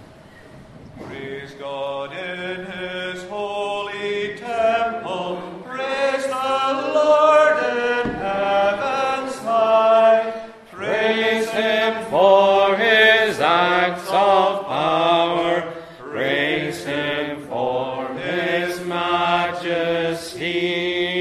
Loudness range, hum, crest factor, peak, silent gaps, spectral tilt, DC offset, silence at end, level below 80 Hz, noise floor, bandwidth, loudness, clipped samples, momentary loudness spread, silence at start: 9 LU; none; 18 dB; -2 dBFS; none; -4.5 dB/octave; under 0.1%; 0 s; -56 dBFS; -44 dBFS; 13.5 kHz; -19 LUFS; under 0.1%; 15 LU; 0 s